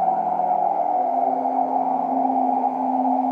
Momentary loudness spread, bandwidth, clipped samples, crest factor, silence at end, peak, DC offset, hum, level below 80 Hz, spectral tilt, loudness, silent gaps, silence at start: 1 LU; 3.4 kHz; under 0.1%; 12 dB; 0 s; -10 dBFS; under 0.1%; none; under -90 dBFS; -9 dB/octave; -21 LUFS; none; 0 s